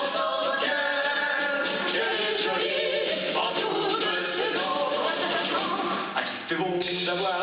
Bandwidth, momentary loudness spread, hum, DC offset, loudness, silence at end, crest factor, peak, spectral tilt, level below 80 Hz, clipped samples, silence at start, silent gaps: 5.4 kHz; 3 LU; none; under 0.1%; -26 LUFS; 0 s; 14 dB; -12 dBFS; -0.5 dB/octave; -68 dBFS; under 0.1%; 0 s; none